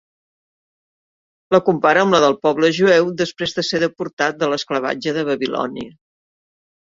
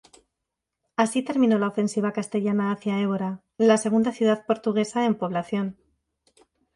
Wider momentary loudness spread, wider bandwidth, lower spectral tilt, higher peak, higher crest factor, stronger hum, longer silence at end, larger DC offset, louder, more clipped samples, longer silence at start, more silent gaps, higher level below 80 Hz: about the same, 9 LU vs 8 LU; second, 7.8 kHz vs 11.5 kHz; second, -4.5 dB/octave vs -6 dB/octave; about the same, -2 dBFS vs -4 dBFS; about the same, 18 dB vs 20 dB; neither; about the same, 0.95 s vs 1.05 s; neither; first, -18 LUFS vs -24 LUFS; neither; first, 1.5 s vs 1 s; first, 4.13-4.17 s vs none; first, -60 dBFS vs -68 dBFS